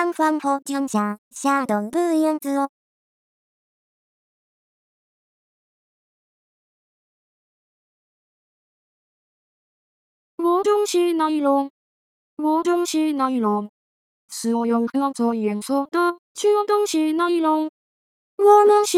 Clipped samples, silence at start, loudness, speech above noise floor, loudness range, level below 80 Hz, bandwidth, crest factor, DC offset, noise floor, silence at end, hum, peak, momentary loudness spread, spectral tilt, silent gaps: under 0.1%; 0 s; -21 LUFS; over 70 dB; 6 LU; -78 dBFS; 15.5 kHz; 20 dB; under 0.1%; under -90 dBFS; 0 s; none; -2 dBFS; 7 LU; -4.5 dB/octave; 1.18-1.31 s, 2.69-10.38 s, 11.70-12.37 s, 13.69-14.28 s, 16.18-16.35 s, 17.69-18.38 s